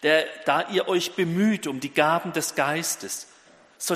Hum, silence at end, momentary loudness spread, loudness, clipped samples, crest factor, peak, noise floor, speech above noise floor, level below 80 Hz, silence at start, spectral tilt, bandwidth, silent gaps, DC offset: none; 0 s; 8 LU; -24 LUFS; under 0.1%; 20 dB; -4 dBFS; -48 dBFS; 23 dB; -72 dBFS; 0 s; -3.5 dB/octave; 15.5 kHz; none; under 0.1%